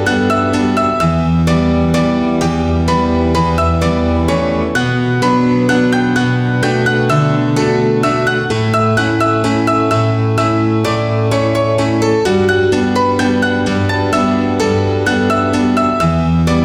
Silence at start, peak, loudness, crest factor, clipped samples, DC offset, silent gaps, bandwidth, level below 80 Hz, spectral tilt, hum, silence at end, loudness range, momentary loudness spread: 0 s; -2 dBFS; -14 LUFS; 12 dB; under 0.1%; under 0.1%; none; 14.5 kHz; -30 dBFS; -6.5 dB/octave; none; 0 s; 1 LU; 2 LU